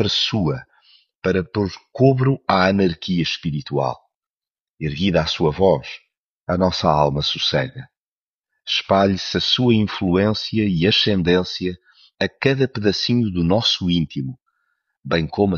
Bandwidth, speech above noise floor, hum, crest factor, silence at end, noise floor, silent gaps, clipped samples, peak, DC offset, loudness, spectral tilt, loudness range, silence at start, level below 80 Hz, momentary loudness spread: 7.2 kHz; over 71 dB; none; 18 dB; 0 s; under -90 dBFS; 1.15-1.20 s, 4.15-4.38 s, 4.50-4.77 s, 6.17-6.44 s, 7.97-8.39 s; under 0.1%; -2 dBFS; under 0.1%; -19 LUFS; -6 dB/octave; 3 LU; 0 s; -46 dBFS; 12 LU